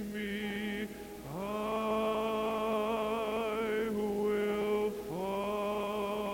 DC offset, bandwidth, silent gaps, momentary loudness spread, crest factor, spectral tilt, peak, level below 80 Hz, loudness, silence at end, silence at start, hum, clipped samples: under 0.1%; 17 kHz; none; 6 LU; 12 dB; -5.5 dB/octave; -22 dBFS; -58 dBFS; -34 LUFS; 0 s; 0 s; none; under 0.1%